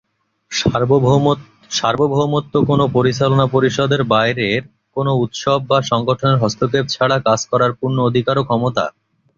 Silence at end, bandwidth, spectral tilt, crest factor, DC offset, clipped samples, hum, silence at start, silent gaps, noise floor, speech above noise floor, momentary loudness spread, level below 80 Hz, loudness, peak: 0.5 s; 7.6 kHz; -5.5 dB/octave; 14 dB; under 0.1%; under 0.1%; none; 0.5 s; none; -44 dBFS; 28 dB; 5 LU; -48 dBFS; -16 LUFS; -2 dBFS